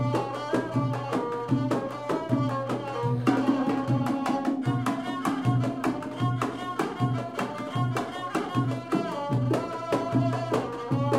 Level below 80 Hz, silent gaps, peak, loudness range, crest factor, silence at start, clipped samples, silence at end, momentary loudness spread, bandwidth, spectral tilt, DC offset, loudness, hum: -60 dBFS; none; -10 dBFS; 2 LU; 18 dB; 0 s; under 0.1%; 0 s; 5 LU; 14 kHz; -7.5 dB/octave; under 0.1%; -28 LUFS; none